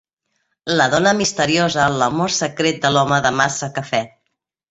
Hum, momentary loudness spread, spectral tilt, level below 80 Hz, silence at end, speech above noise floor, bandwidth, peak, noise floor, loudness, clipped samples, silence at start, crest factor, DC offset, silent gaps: none; 8 LU; -3.5 dB/octave; -52 dBFS; 0.65 s; 57 dB; 8.2 kHz; -2 dBFS; -74 dBFS; -17 LUFS; under 0.1%; 0.65 s; 18 dB; under 0.1%; none